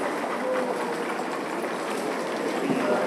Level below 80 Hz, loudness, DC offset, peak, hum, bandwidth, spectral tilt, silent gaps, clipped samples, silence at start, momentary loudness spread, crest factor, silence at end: -84 dBFS; -28 LUFS; under 0.1%; -12 dBFS; none; 15.5 kHz; -4.5 dB/octave; none; under 0.1%; 0 s; 4 LU; 16 dB; 0 s